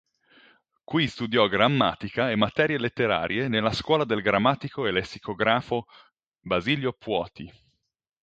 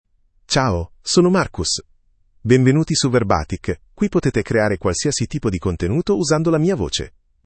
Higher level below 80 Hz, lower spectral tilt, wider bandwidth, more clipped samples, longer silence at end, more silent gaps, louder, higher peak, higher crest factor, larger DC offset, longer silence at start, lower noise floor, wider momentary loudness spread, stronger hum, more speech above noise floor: second, -56 dBFS vs -40 dBFS; about the same, -6 dB/octave vs -5 dB/octave; about the same, 8.8 kHz vs 8.8 kHz; neither; first, 0.75 s vs 0.4 s; first, 6.28-6.32 s vs none; second, -25 LUFS vs -19 LUFS; second, -4 dBFS vs 0 dBFS; about the same, 22 dB vs 18 dB; neither; first, 0.9 s vs 0.5 s; first, -79 dBFS vs -56 dBFS; about the same, 8 LU vs 9 LU; neither; first, 54 dB vs 38 dB